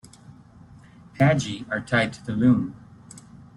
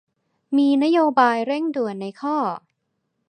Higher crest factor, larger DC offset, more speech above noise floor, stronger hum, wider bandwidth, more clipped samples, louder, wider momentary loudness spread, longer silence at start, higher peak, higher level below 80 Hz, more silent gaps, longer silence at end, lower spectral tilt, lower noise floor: about the same, 18 dB vs 18 dB; neither; second, 27 dB vs 55 dB; neither; first, 11.5 kHz vs 9.4 kHz; neither; second, -23 LUFS vs -20 LUFS; first, 24 LU vs 10 LU; first, 1.15 s vs 0.5 s; second, -8 dBFS vs -2 dBFS; first, -56 dBFS vs -80 dBFS; neither; second, 0.2 s vs 0.7 s; about the same, -6.5 dB/octave vs -6 dB/octave; second, -49 dBFS vs -75 dBFS